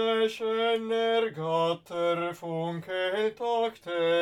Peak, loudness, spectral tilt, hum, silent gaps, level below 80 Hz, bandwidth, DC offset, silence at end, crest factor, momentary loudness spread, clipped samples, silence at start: -16 dBFS; -29 LUFS; -5.5 dB/octave; none; none; -76 dBFS; 13.5 kHz; under 0.1%; 0 s; 12 dB; 6 LU; under 0.1%; 0 s